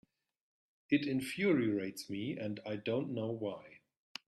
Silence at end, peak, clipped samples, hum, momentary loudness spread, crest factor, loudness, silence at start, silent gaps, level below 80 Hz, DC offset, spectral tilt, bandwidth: 0.5 s; -18 dBFS; under 0.1%; none; 10 LU; 20 dB; -36 LUFS; 0.9 s; none; -76 dBFS; under 0.1%; -6 dB/octave; 13.5 kHz